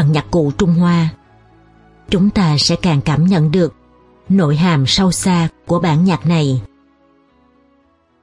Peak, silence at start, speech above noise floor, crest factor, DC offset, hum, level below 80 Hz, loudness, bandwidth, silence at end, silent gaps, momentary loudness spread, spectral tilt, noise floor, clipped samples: -2 dBFS; 0 s; 42 dB; 14 dB; under 0.1%; none; -38 dBFS; -14 LUFS; 11.5 kHz; 1.55 s; none; 5 LU; -6 dB/octave; -56 dBFS; under 0.1%